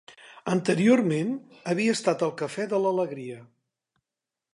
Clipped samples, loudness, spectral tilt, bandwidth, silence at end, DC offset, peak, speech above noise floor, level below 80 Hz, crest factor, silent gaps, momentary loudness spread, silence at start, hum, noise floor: under 0.1%; -25 LUFS; -6 dB/octave; 11.5 kHz; 1.1 s; under 0.1%; -8 dBFS; 63 dB; -76 dBFS; 18 dB; none; 16 LU; 0.1 s; none; -89 dBFS